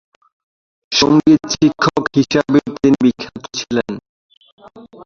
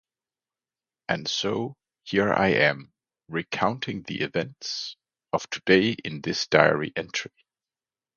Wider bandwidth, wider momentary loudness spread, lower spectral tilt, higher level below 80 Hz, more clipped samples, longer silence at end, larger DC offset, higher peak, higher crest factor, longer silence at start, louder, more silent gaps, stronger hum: about the same, 7.4 kHz vs 7.2 kHz; about the same, 14 LU vs 13 LU; about the same, -5 dB/octave vs -4.5 dB/octave; first, -48 dBFS vs -60 dBFS; neither; second, 0 s vs 0.9 s; neither; about the same, 0 dBFS vs -2 dBFS; second, 16 dB vs 26 dB; second, 0.9 s vs 1.1 s; first, -15 LUFS vs -25 LUFS; first, 4.09-4.29 s, 4.37-4.41 s, 4.52-4.58 s vs none; neither